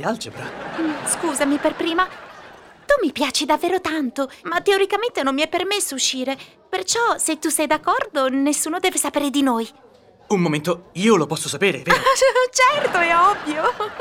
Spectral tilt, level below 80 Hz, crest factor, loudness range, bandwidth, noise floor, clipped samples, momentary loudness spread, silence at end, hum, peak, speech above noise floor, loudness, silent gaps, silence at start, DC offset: -3 dB/octave; -54 dBFS; 18 dB; 4 LU; 17.5 kHz; -44 dBFS; under 0.1%; 10 LU; 0 s; none; -2 dBFS; 24 dB; -20 LUFS; none; 0 s; under 0.1%